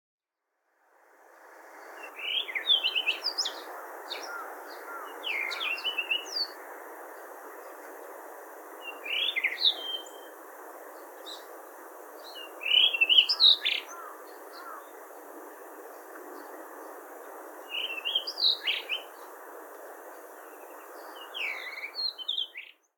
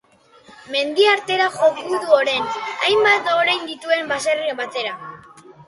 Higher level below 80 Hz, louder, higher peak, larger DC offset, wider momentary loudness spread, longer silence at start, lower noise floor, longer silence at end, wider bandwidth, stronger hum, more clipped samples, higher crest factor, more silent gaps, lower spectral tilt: second, under -90 dBFS vs -66 dBFS; second, -26 LUFS vs -18 LUFS; second, -8 dBFS vs -2 dBFS; neither; first, 22 LU vs 10 LU; first, 1.2 s vs 0.5 s; first, -82 dBFS vs -50 dBFS; first, 0.25 s vs 0.05 s; first, 18 kHz vs 11.5 kHz; neither; neither; first, 26 dB vs 18 dB; neither; second, 4 dB/octave vs -2 dB/octave